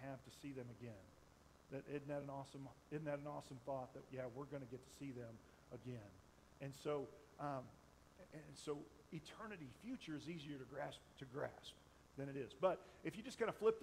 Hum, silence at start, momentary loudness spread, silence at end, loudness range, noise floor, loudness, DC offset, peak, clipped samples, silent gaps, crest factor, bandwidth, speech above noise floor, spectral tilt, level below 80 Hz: none; 0 s; 17 LU; 0 s; 4 LU; -69 dBFS; -50 LUFS; under 0.1%; -26 dBFS; under 0.1%; none; 24 dB; 15.5 kHz; 20 dB; -6 dB/octave; -76 dBFS